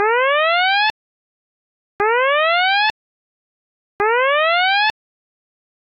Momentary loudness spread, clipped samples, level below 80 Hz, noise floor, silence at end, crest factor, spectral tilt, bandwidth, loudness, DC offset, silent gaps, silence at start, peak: 6 LU; under 0.1%; -60 dBFS; under -90 dBFS; 1.1 s; 12 dB; -2.5 dB/octave; 8 kHz; -16 LUFS; under 0.1%; 0.90-1.99 s, 2.90-3.99 s; 0 s; -8 dBFS